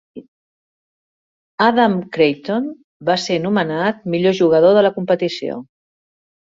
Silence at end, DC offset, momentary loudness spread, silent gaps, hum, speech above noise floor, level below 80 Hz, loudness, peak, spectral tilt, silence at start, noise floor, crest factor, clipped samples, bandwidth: 0.85 s; under 0.1%; 13 LU; 0.28-1.58 s, 2.84-3.00 s; none; over 74 dB; -62 dBFS; -17 LUFS; -2 dBFS; -6 dB/octave; 0.15 s; under -90 dBFS; 16 dB; under 0.1%; 7.8 kHz